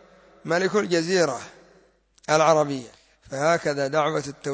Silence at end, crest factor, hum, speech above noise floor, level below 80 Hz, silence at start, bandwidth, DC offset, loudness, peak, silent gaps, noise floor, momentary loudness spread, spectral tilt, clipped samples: 0 s; 18 dB; none; 36 dB; -64 dBFS; 0.45 s; 8 kHz; under 0.1%; -23 LUFS; -6 dBFS; none; -59 dBFS; 16 LU; -4.5 dB/octave; under 0.1%